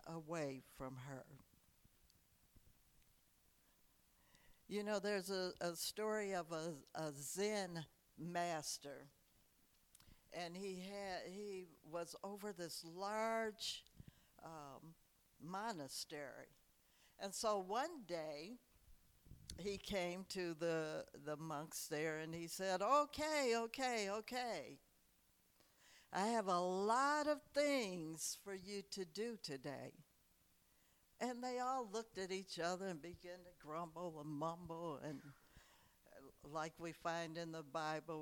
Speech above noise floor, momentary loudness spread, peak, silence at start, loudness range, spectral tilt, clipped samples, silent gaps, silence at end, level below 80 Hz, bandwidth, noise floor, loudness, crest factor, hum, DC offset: 31 dB; 17 LU; -24 dBFS; 0 s; 10 LU; -3.5 dB/octave; under 0.1%; none; 0 s; -76 dBFS; 19 kHz; -76 dBFS; -45 LUFS; 22 dB; none; under 0.1%